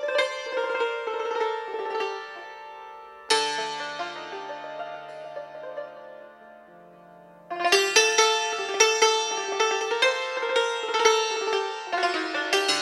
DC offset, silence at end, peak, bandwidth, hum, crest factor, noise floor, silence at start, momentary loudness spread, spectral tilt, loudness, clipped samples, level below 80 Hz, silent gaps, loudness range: under 0.1%; 0 s; -4 dBFS; 15.5 kHz; none; 22 dB; -50 dBFS; 0 s; 19 LU; 0.5 dB/octave; -24 LUFS; under 0.1%; -78 dBFS; none; 14 LU